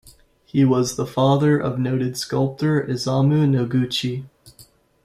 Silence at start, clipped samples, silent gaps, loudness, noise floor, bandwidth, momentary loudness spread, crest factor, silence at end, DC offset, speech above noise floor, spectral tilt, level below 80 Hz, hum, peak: 0.05 s; under 0.1%; none; -20 LUFS; -52 dBFS; 14.5 kHz; 6 LU; 16 dB; 0.45 s; under 0.1%; 33 dB; -6.5 dB/octave; -54 dBFS; none; -4 dBFS